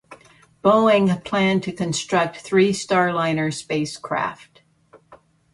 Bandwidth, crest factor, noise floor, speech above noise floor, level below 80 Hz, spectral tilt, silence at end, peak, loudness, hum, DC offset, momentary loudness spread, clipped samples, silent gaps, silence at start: 11.5 kHz; 18 dB; -54 dBFS; 34 dB; -58 dBFS; -5 dB/octave; 0.4 s; -4 dBFS; -20 LUFS; none; under 0.1%; 9 LU; under 0.1%; none; 0.1 s